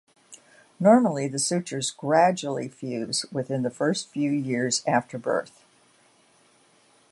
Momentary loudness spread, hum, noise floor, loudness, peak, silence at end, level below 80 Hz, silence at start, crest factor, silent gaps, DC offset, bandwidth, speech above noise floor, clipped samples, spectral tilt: 10 LU; none; -60 dBFS; -25 LUFS; -6 dBFS; 1.65 s; -74 dBFS; 0.3 s; 20 dB; none; under 0.1%; 11.5 kHz; 36 dB; under 0.1%; -4.5 dB/octave